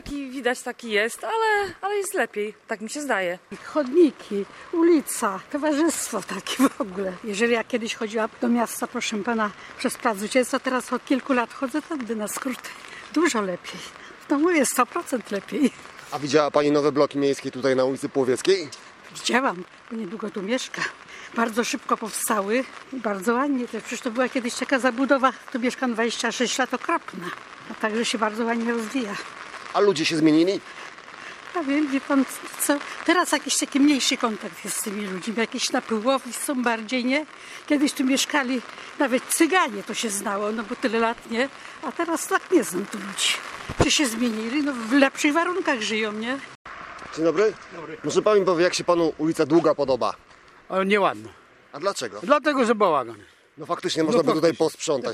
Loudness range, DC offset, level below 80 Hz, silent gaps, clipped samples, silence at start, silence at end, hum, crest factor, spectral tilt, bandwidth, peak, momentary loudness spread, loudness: 3 LU; under 0.1%; -58 dBFS; 46.55-46.65 s; under 0.1%; 0.05 s; 0 s; none; 22 dB; -3.5 dB/octave; 16 kHz; -2 dBFS; 13 LU; -24 LUFS